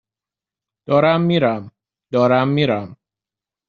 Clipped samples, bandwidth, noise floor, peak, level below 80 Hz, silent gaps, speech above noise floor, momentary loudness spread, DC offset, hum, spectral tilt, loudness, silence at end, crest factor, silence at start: under 0.1%; 6.8 kHz; -89 dBFS; -2 dBFS; -60 dBFS; none; 73 dB; 9 LU; under 0.1%; none; -5.5 dB/octave; -17 LUFS; 0.75 s; 18 dB; 0.9 s